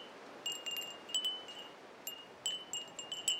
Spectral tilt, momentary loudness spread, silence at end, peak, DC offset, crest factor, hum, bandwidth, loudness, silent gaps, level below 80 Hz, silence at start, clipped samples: 1 dB/octave; 12 LU; 0 s; -18 dBFS; under 0.1%; 24 dB; none; 16.5 kHz; -40 LUFS; none; -88 dBFS; 0 s; under 0.1%